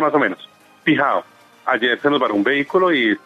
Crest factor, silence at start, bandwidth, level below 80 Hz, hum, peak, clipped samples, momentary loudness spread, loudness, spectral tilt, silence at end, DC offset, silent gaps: 16 dB; 0 s; 7.8 kHz; -70 dBFS; none; -2 dBFS; under 0.1%; 7 LU; -18 LUFS; -6.5 dB/octave; 0.1 s; under 0.1%; none